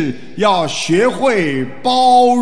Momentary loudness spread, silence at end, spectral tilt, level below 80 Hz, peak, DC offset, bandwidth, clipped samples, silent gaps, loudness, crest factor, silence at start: 9 LU; 0 s; -4.5 dB/octave; -56 dBFS; -2 dBFS; 3%; 10.5 kHz; under 0.1%; none; -14 LUFS; 12 dB; 0 s